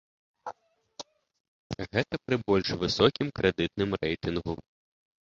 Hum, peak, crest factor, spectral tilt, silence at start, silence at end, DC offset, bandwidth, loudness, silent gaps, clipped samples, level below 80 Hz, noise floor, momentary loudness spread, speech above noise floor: none; -6 dBFS; 24 dB; -5.5 dB/octave; 0.45 s; 0.7 s; under 0.1%; 7.6 kHz; -28 LUFS; 1.40-1.70 s; under 0.1%; -52 dBFS; -51 dBFS; 20 LU; 23 dB